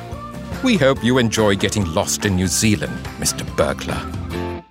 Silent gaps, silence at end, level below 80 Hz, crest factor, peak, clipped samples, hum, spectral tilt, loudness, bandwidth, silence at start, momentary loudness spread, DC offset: none; 0.1 s; -38 dBFS; 18 dB; -2 dBFS; under 0.1%; none; -4 dB/octave; -19 LUFS; 16 kHz; 0 s; 11 LU; under 0.1%